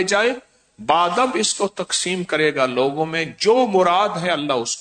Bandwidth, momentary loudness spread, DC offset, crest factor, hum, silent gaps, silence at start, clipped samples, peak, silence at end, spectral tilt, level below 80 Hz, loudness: 9.4 kHz; 6 LU; under 0.1%; 16 dB; none; none; 0 s; under 0.1%; -4 dBFS; 0 s; -3 dB/octave; -62 dBFS; -19 LUFS